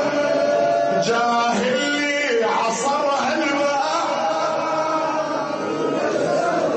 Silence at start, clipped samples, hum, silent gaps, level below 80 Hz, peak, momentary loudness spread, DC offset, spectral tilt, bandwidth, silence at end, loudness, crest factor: 0 s; under 0.1%; none; none; -64 dBFS; -8 dBFS; 4 LU; under 0.1%; -3.5 dB/octave; 8.8 kHz; 0 s; -20 LUFS; 12 dB